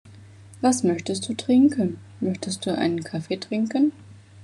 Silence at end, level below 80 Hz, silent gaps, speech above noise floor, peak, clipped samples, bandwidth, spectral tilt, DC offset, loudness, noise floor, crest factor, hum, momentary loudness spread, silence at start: 0 s; -68 dBFS; none; 23 dB; -8 dBFS; under 0.1%; 12 kHz; -5 dB/octave; under 0.1%; -24 LUFS; -46 dBFS; 16 dB; none; 11 LU; 0.05 s